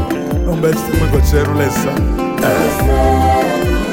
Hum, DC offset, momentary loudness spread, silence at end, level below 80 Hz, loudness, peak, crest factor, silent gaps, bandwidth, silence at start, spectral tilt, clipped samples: none; under 0.1%; 5 LU; 0 s; -20 dBFS; -14 LUFS; 0 dBFS; 12 dB; none; 17 kHz; 0 s; -6 dB/octave; under 0.1%